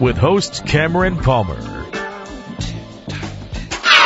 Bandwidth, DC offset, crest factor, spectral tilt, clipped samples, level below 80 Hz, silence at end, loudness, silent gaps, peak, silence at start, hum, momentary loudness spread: 12 kHz; under 0.1%; 18 dB; -4.5 dB/octave; under 0.1%; -32 dBFS; 0 s; -18 LUFS; none; 0 dBFS; 0 s; none; 15 LU